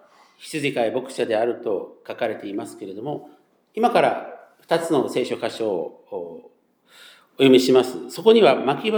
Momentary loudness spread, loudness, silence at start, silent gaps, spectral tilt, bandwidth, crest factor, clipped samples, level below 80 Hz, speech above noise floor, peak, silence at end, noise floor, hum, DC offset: 19 LU; -21 LUFS; 0.4 s; none; -5 dB/octave; over 20 kHz; 20 dB; under 0.1%; -80 dBFS; 34 dB; -2 dBFS; 0 s; -55 dBFS; none; under 0.1%